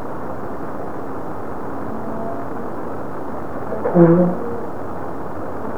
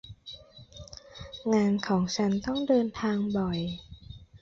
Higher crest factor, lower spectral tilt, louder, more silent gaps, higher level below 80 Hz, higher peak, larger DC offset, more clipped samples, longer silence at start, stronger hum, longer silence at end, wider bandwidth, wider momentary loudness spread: first, 22 dB vs 16 dB; first, -10 dB/octave vs -6 dB/octave; first, -22 LUFS vs -28 LUFS; neither; first, -48 dBFS vs -54 dBFS; first, 0 dBFS vs -14 dBFS; first, 5% vs under 0.1%; neither; about the same, 0 s vs 0.05 s; neither; about the same, 0 s vs 0.05 s; second, 5.2 kHz vs 7.6 kHz; second, 15 LU vs 22 LU